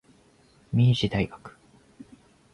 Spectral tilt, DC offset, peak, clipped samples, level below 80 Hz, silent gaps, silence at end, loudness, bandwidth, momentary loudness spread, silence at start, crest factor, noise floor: -7 dB/octave; under 0.1%; -10 dBFS; under 0.1%; -50 dBFS; none; 1.05 s; -25 LUFS; 10 kHz; 12 LU; 0.7 s; 18 dB; -59 dBFS